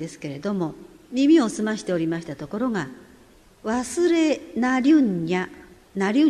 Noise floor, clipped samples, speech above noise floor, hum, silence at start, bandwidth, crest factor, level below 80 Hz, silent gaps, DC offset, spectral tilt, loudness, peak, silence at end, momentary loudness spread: -52 dBFS; under 0.1%; 30 dB; none; 0 s; 12 kHz; 16 dB; -58 dBFS; none; under 0.1%; -5.5 dB/octave; -23 LUFS; -8 dBFS; 0 s; 14 LU